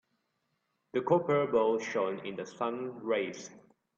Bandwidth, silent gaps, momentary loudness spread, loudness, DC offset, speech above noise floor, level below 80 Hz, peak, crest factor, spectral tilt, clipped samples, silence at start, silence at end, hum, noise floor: 7.6 kHz; none; 12 LU; -32 LUFS; under 0.1%; 49 dB; -76 dBFS; -14 dBFS; 20 dB; -5.5 dB/octave; under 0.1%; 0.95 s; 0.4 s; none; -80 dBFS